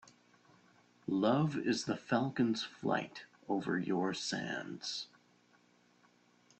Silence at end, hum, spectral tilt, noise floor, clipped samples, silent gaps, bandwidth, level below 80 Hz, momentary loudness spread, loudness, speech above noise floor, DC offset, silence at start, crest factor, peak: 1.55 s; 60 Hz at -60 dBFS; -5 dB/octave; -69 dBFS; under 0.1%; none; 8.8 kHz; -76 dBFS; 10 LU; -36 LUFS; 34 dB; under 0.1%; 1.1 s; 18 dB; -18 dBFS